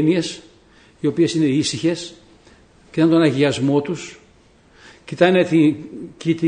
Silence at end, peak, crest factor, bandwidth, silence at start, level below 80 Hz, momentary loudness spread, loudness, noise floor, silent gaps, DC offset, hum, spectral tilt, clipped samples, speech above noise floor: 0 s; -2 dBFS; 18 dB; 9.6 kHz; 0 s; -56 dBFS; 18 LU; -18 LUFS; -52 dBFS; none; under 0.1%; none; -6 dB/octave; under 0.1%; 34 dB